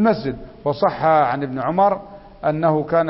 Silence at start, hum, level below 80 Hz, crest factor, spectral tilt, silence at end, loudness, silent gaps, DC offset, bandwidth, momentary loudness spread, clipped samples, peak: 0 s; none; -48 dBFS; 16 dB; -11.5 dB/octave; 0 s; -20 LUFS; none; under 0.1%; 5.8 kHz; 10 LU; under 0.1%; -4 dBFS